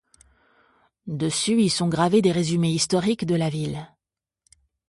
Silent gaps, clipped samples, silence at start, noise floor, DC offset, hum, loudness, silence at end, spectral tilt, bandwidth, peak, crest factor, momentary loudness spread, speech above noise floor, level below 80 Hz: none; under 0.1%; 1.05 s; -89 dBFS; under 0.1%; none; -22 LUFS; 1.05 s; -5 dB/octave; 11.5 kHz; -6 dBFS; 18 dB; 12 LU; 67 dB; -58 dBFS